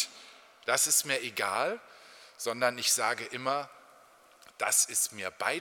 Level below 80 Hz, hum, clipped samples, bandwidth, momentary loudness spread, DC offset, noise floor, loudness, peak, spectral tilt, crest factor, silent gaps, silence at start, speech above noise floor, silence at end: -84 dBFS; none; under 0.1%; 19 kHz; 12 LU; under 0.1%; -59 dBFS; -29 LUFS; -12 dBFS; 0 dB/octave; 20 dB; none; 0 s; 28 dB; 0 s